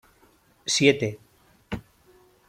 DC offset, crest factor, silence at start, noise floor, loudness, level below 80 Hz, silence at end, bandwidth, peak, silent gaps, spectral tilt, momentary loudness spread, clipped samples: under 0.1%; 24 dB; 0.65 s; -60 dBFS; -23 LUFS; -56 dBFS; 0.7 s; 14.5 kHz; -4 dBFS; none; -3.5 dB/octave; 18 LU; under 0.1%